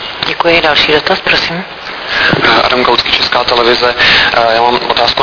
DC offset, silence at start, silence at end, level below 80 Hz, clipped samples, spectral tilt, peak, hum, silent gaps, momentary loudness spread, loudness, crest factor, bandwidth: under 0.1%; 0 s; 0 s; -36 dBFS; 0.7%; -4 dB/octave; 0 dBFS; none; none; 9 LU; -8 LUFS; 10 dB; 5.4 kHz